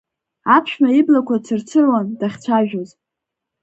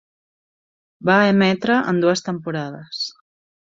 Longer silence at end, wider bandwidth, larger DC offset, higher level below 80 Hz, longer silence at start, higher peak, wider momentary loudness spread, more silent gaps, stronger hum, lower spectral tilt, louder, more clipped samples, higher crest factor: first, 0.75 s vs 0.6 s; about the same, 8.2 kHz vs 7.6 kHz; neither; about the same, -66 dBFS vs -62 dBFS; second, 0.45 s vs 1 s; about the same, 0 dBFS vs -2 dBFS; about the same, 11 LU vs 13 LU; neither; neither; about the same, -6.5 dB/octave vs -5.5 dB/octave; about the same, -17 LUFS vs -19 LUFS; neither; about the same, 16 dB vs 20 dB